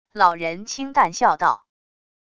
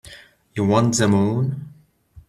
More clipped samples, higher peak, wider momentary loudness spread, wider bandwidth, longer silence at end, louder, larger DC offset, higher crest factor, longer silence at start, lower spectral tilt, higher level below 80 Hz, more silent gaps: neither; about the same, -2 dBFS vs -4 dBFS; second, 10 LU vs 14 LU; second, 10 kHz vs 13.5 kHz; first, 0.8 s vs 0.1 s; about the same, -20 LUFS vs -19 LUFS; neither; about the same, 20 dB vs 18 dB; about the same, 0.15 s vs 0.05 s; second, -3 dB/octave vs -5.5 dB/octave; second, -60 dBFS vs -54 dBFS; neither